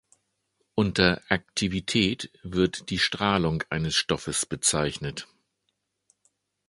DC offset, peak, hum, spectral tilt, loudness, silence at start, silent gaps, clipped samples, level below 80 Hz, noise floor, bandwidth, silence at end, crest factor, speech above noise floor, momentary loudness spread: under 0.1%; -2 dBFS; none; -3.5 dB/octave; -26 LUFS; 0.75 s; none; under 0.1%; -48 dBFS; -78 dBFS; 11.5 kHz; 1.45 s; 26 dB; 52 dB; 9 LU